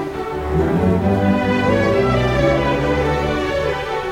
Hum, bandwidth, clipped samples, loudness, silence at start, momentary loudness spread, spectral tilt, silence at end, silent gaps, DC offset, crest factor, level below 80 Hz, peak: none; 16.5 kHz; under 0.1%; -18 LUFS; 0 s; 5 LU; -7 dB/octave; 0 s; none; under 0.1%; 14 dB; -30 dBFS; -4 dBFS